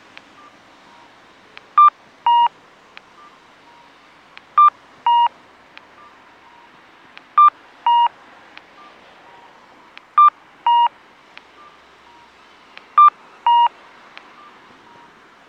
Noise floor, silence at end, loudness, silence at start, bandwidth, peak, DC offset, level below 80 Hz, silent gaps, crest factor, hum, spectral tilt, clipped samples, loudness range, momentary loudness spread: -48 dBFS; 1.8 s; -15 LUFS; 1.75 s; 6.4 kHz; -4 dBFS; under 0.1%; -74 dBFS; none; 16 dB; none; -1.5 dB/octave; under 0.1%; 2 LU; 8 LU